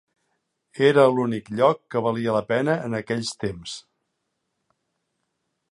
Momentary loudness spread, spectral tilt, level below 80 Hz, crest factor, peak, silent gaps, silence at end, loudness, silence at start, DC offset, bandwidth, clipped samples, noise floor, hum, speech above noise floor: 16 LU; -5.5 dB/octave; -60 dBFS; 22 dB; -4 dBFS; none; 1.9 s; -22 LUFS; 0.75 s; under 0.1%; 11.5 kHz; under 0.1%; -77 dBFS; none; 55 dB